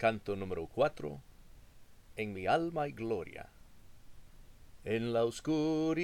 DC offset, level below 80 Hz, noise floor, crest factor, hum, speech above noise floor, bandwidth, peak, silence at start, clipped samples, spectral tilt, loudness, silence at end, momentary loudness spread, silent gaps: under 0.1%; -58 dBFS; -56 dBFS; 20 dB; none; 22 dB; 16 kHz; -16 dBFS; 0 s; under 0.1%; -6 dB/octave; -35 LUFS; 0 s; 16 LU; none